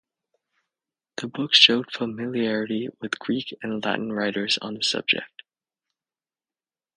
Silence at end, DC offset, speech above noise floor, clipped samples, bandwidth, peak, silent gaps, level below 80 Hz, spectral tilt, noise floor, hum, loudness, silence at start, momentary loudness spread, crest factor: 1.7 s; under 0.1%; over 66 dB; under 0.1%; 10 kHz; 0 dBFS; none; -72 dBFS; -3 dB/octave; under -90 dBFS; none; -22 LUFS; 1.2 s; 16 LU; 26 dB